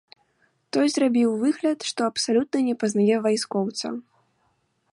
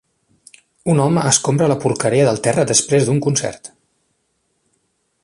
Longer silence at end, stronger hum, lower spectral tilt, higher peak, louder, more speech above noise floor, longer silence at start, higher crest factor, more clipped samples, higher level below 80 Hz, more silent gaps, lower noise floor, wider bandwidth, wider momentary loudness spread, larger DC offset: second, 0.9 s vs 1.55 s; neither; about the same, -4.5 dB/octave vs -4.5 dB/octave; second, -10 dBFS vs 0 dBFS; second, -23 LUFS vs -16 LUFS; second, 46 dB vs 52 dB; about the same, 0.75 s vs 0.85 s; about the same, 14 dB vs 18 dB; neither; second, -72 dBFS vs -54 dBFS; neither; about the same, -69 dBFS vs -67 dBFS; about the same, 11.5 kHz vs 11.5 kHz; about the same, 8 LU vs 7 LU; neither